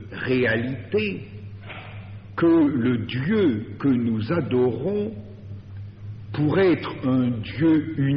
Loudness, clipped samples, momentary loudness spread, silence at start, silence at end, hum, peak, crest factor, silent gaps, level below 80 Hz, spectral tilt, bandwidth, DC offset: -23 LUFS; under 0.1%; 19 LU; 0 s; 0 s; none; -10 dBFS; 14 dB; none; -52 dBFS; -6.5 dB/octave; 5.6 kHz; under 0.1%